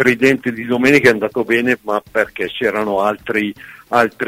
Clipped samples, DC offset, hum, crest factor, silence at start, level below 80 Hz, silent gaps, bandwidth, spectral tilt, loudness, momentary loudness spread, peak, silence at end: under 0.1%; under 0.1%; none; 16 dB; 0 s; -52 dBFS; none; 16 kHz; -5 dB/octave; -16 LUFS; 8 LU; 0 dBFS; 0 s